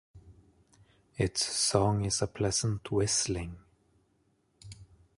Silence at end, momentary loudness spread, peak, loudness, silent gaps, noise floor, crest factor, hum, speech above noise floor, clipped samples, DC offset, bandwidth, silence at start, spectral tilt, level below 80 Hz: 0.35 s; 24 LU; -10 dBFS; -29 LUFS; none; -72 dBFS; 24 dB; none; 42 dB; under 0.1%; under 0.1%; 11.5 kHz; 0.15 s; -4 dB/octave; -52 dBFS